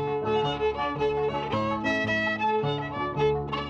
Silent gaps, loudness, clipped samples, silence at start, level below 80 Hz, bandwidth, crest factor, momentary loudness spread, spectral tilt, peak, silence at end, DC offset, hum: none; -27 LUFS; under 0.1%; 0 s; -48 dBFS; 7.6 kHz; 12 dB; 3 LU; -6.5 dB/octave; -14 dBFS; 0 s; under 0.1%; none